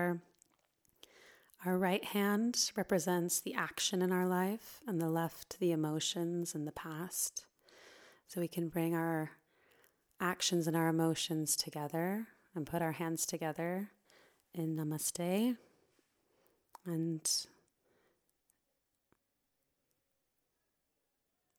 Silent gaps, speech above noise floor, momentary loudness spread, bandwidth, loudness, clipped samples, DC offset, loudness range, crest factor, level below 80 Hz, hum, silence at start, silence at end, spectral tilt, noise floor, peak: none; 48 dB; 10 LU; over 20 kHz; -36 LUFS; under 0.1%; under 0.1%; 7 LU; 22 dB; -78 dBFS; none; 0 s; 4.15 s; -4 dB/octave; -84 dBFS; -16 dBFS